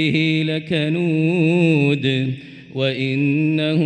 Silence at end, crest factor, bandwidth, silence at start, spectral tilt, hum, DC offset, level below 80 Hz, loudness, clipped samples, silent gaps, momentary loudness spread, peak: 0 s; 14 dB; 9 kHz; 0 s; -7.5 dB/octave; none; under 0.1%; -60 dBFS; -18 LUFS; under 0.1%; none; 7 LU; -6 dBFS